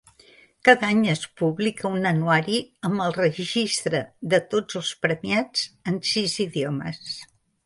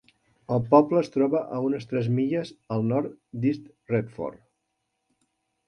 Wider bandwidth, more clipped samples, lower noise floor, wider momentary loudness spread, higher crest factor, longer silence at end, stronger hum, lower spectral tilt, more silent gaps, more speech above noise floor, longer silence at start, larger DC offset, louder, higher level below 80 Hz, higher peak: first, 11.5 kHz vs 9.2 kHz; neither; second, -54 dBFS vs -78 dBFS; second, 9 LU vs 15 LU; about the same, 24 dB vs 22 dB; second, 0.4 s vs 1.35 s; neither; second, -4.5 dB/octave vs -9 dB/octave; neither; second, 31 dB vs 53 dB; first, 0.65 s vs 0.5 s; neither; first, -23 LUFS vs -26 LUFS; about the same, -64 dBFS vs -64 dBFS; first, 0 dBFS vs -4 dBFS